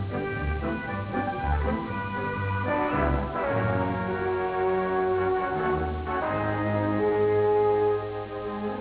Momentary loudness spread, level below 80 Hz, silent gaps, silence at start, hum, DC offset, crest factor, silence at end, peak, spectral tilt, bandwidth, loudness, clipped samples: 7 LU; -38 dBFS; none; 0 s; none; under 0.1%; 14 dB; 0 s; -14 dBFS; -11 dB/octave; 4 kHz; -27 LUFS; under 0.1%